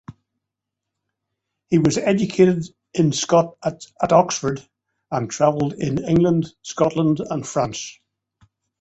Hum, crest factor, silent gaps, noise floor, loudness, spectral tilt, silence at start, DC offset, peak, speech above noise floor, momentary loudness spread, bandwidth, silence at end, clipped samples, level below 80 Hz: none; 18 dB; none; -83 dBFS; -20 LUFS; -6 dB/octave; 0.1 s; under 0.1%; -2 dBFS; 64 dB; 11 LU; 8.2 kHz; 0.9 s; under 0.1%; -52 dBFS